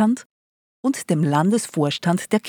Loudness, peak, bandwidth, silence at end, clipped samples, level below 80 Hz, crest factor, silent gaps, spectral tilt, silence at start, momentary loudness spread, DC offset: -21 LUFS; -4 dBFS; over 20 kHz; 0 s; under 0.1%; -72 dBFS; 16 dB; 0.25-0.83 s; -5.5 dB/octave; 0 s; 7 LU; under 0.1%